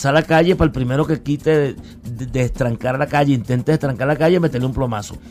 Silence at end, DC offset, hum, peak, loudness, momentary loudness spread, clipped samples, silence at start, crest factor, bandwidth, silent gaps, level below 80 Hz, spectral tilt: 0 s; under 0.1%; none; -2 dBFS; -18 LUFS; 9 LU; under 0.1%; 0 s; 16 dB; 15 kHz; none; -36 dBFS; -7 dB/octave